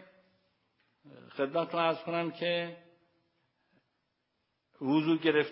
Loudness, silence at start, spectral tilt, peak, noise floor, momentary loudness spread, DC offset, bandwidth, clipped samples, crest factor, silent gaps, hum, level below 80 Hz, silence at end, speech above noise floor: -31 LUFS; 1.05 s; -3.5 dB/octave; -14 dBFS; -80 dBFS; 11 LU; under 0.1%; 5.6 kHz; under 0.1%; 20 dB; none; none; -88 dBFS; 0 s; 50 dB